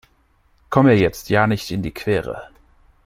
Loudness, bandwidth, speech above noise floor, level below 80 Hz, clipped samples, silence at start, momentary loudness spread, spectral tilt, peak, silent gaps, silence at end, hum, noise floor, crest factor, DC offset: -18 LUFS; 16 kHz; 41 dB; -44 dBFS; under 0.1%; 0.7 s; 12 LU; -7 dB/octave; -2 dBFS; none; 0.6 s; none; -59 dBFS; 18 dB; under 0.1%